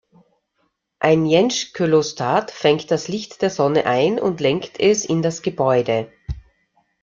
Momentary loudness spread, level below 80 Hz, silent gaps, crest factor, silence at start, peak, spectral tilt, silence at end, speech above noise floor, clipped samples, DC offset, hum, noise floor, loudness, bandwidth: 7 LU; -46 dBFS; none; 18 dB; 1 s; -2 dBFS; -5 dB/octave; 0.65 s; 51 dB; under 0.1%; under 0.1%; none; -69 dBFS; -19 LUFS; 7.6 kHz